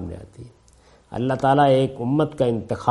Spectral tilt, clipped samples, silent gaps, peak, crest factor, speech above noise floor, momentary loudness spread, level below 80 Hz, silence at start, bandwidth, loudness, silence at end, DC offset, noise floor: -7.5 dB/octave; under 0.1%; none; -2 dBFS; 20 dB; 33 dB; 19 LU; -52 dBFS; 0 s; 11.5 kHz; -20 LUFS; 0 s; under 0.1%; -53 dBFS